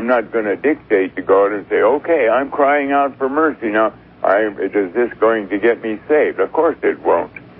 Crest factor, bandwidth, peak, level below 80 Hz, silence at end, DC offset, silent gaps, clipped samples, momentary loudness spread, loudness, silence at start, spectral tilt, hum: 14 dB; 4.2 kHz; -2 dBFS; -56 dBFS; 0.15 s; under 0.1%; none; under 0.1%; 4 LU; -16 LUFS; 0 s; -10 dB/octave; 60 Hz at -50 dBFS